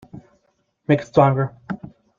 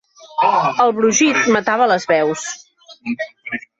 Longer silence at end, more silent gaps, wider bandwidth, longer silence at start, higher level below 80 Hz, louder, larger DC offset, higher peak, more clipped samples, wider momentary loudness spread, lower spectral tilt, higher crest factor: about the same, 0.3 s vs 0.2 s; neither; second, 7.4 kHz vs 8.2 kHz; about the same, 0.15 s vs 0.25 s; first, -56 dBFS vs -62 dBFS; second, -19 LUFS vs -16 LUFS; neither; about the same, -2 dBFS vs -2 dBFS; neither; first, 17 LU vs 14 LU; first, -8.5 dB/octave vs -3 dB/octave; first, 20 dB vs 14 dB